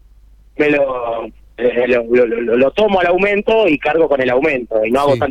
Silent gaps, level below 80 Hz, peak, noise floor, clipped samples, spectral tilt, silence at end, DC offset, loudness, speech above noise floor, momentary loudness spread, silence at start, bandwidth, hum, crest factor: none; -42 dBFS; -2 dBFS; -45 dBFS; under 0.1%; -6.5 dB/octave; 0 s; under 0.1%; -14 LUFS; 31 dB; 7 LU; 0.6 s; 11 kHz; none; 12 dB